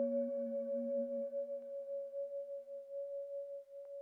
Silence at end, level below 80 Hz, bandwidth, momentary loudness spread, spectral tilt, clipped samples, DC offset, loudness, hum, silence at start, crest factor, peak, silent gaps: 0 s; under -90 dBFS; 2.4 kHz; 9 LU; -9 dB/octave; under 0.1%; under 0.1%; -42 LUFS; none; 0 s; 14 dB; -28 dBFS; none